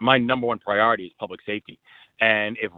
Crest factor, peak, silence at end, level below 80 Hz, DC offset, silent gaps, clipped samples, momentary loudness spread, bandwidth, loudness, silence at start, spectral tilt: 22 dB; -2 dBFS; 0.1 s; -62 dBFS; under 0.1%; none; under 0.1%; 13 LU; 4.7 kHz; -22 LUFS; 0 s; -7.5 dB/octave